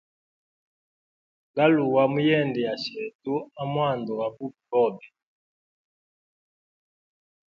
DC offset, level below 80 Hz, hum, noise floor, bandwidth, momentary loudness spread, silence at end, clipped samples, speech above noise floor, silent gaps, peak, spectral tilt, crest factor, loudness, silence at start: under 0.1%; -72 dBFS; none; under -90 dBFS; 7.2 kHz; 12 LU; 2.5 s; under 0.1%; over 66 dB; 3.15-3.19 s; -6 dBFS; -7.5 dB/octave; 20 dB; -25 LUFS; 1.55 s